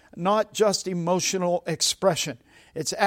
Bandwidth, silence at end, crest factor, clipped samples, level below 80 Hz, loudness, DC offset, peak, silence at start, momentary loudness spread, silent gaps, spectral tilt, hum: 16.5 kHz; 0 s; 18 dB; under 0.1%; -64 dBFS; -24 LUFS; under 0.1%; -8 dBFS; 0.15 s; 9 LU; none; -3.5 dB/octave; none